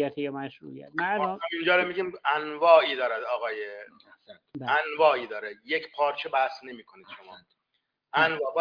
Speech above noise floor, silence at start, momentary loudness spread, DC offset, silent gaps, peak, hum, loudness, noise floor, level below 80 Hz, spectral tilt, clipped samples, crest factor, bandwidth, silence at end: 52 dB; 0 s; 23 LU; under 0.1%; none; -4 dBFS; none; -26 LUFS; -79 dBFS; -78 dBFS; -6 dB/octave; under 0.1%; 22 dB; 5.2 kHz; 0 s